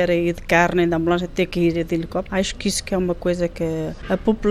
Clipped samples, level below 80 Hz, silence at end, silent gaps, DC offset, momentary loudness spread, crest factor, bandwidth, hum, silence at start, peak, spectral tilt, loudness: under 0.1%; -38 dBFS; 0 s; none; under 0.1%; 7 LU; 18 dB; 14.5 kHz; none; 0 s; -2 dBFS; -5.5 dB/octave; -21 LUFS